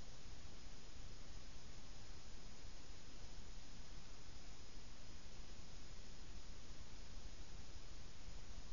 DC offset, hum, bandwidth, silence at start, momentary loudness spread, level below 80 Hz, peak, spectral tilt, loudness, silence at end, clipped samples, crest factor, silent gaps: 0.6%; none; 7.2 kHz; 0 s; 1 LU; -58 dBFS; -38 dBFS; -3.5 dB/octave; -59 LUFS; 0 s; under 0.1%; 14 dB; none